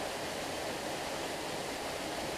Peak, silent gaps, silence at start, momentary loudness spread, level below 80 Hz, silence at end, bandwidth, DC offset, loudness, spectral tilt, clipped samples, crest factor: -26 dBFS; none; 0 s; 0 LU; -60 dBFS; 0 s; 15.5 kHz; under 0.1%; -37 LUFS; -2.5 dB/octave; under 0.1%; 12 dB